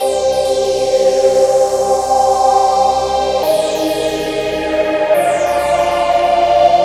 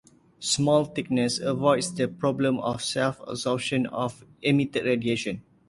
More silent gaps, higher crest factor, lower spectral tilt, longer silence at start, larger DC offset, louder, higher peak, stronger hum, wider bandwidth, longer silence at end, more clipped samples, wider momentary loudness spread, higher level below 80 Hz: neither; second, 12 dB vs 18 dB; about the same, -3.5 dB/octave vs -4.5 dB/octave; second, 0 s vs 0.4 s; neither; first, -13 LUFS vs -26 LUFS; first, 0 dBFS vs -8 dBFS; neither; first, 16 kHz vs 11.5 kHz; second, 0 s vs 0.3 s; neither; about the same, 5 LU vs 7 LU; first, -40 dBFS vs -60 dBFS